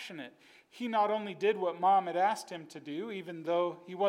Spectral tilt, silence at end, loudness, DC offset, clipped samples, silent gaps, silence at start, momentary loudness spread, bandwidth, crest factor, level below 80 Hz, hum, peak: -5 dB/octave; 0 s; -32 LUFS; under 0.1%; under 0.1%; none; 0 s; 16 LU; 14.5 kHz; 16 dB; under -90 dBFS; none; -18 dBFS